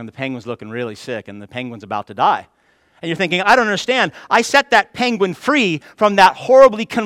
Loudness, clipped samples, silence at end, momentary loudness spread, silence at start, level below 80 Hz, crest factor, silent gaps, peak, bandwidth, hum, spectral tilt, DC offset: -15 LUFS; 0.1%; 0 s; 17 LU; 0 s; -56 dBFS; 16 dB; none; 0 dBFS; 14.5 kHz; none; -4 dB/octave; under 0.1%